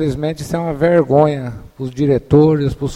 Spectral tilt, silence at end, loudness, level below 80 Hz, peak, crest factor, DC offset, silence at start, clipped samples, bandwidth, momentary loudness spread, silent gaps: -8 dB/octave; 0 s; -15 LUFS; -38 dBFS; 0 dBFS; 14 dB; under 0.1%; 0 s; under 0.1%; 13 kHz; 14 LU; none